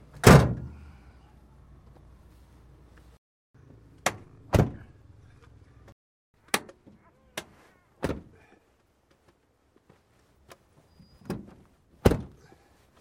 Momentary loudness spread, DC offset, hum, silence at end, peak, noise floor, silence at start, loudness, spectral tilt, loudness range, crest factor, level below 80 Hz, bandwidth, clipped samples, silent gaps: 30 LU; under 0.1%; none; 0.75 s; 0 dBFS; -67 dBFS; 0.25 s; -25 LUFS; -5.5 dB/octave; 14 LU; 30 dB; -42 dBFS; 16.5 kHz; under 0.1%; 3.18-3.54 s, 5.92-6.34 s